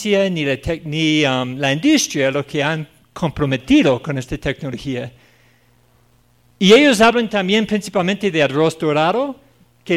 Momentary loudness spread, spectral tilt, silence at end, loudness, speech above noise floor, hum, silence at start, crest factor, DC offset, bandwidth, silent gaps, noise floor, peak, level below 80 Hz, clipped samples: 13 LU; -4.5 dB/octave; 0 s; -17 LUFS; 39 dB; none; 0 s; 16 dB; under 0.1%; 15 kHz; none; -56 dBFS; 0 dBFS; -44 dBFS; under 0.1%